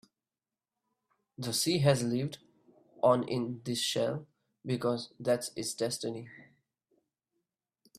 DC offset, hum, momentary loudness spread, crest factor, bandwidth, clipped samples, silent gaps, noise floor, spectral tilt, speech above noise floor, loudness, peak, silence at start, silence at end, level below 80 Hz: under 0.1%; none; 14 LU; 24 dB; 15.5 kHz; under 0.1%; none; under -90 dBFS; -4.5 dB/octave; over 59 dB; -32 LUFS; -10 dBFS; 1.4 s; 1.55 s; -72 dBFS